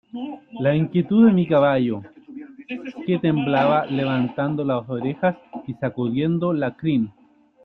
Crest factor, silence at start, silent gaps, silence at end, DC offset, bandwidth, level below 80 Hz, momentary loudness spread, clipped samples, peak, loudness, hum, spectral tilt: 16 dB; 0.15 s; none; 0.55 s; under 0.1%; 4.5 kHz; -60 dBFS; 17 LU; under 0.1%; -4 dBFS; -21 LUFS; none; -10 dB/octave